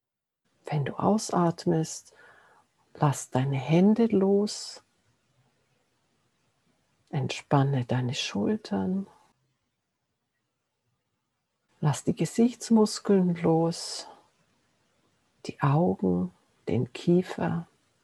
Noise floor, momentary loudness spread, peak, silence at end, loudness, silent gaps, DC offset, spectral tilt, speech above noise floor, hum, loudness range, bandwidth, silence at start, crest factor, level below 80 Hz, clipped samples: -80 dBFS; 13 LU; -8 dBFS; 0.4 s; -27 LUFS; none; under 0.1%; -6.5 dB/octave; 55 dB; none; 8 LU; 12.5 kHz; 0.65 s; 22 dB; -70 dBFS; under 0.1%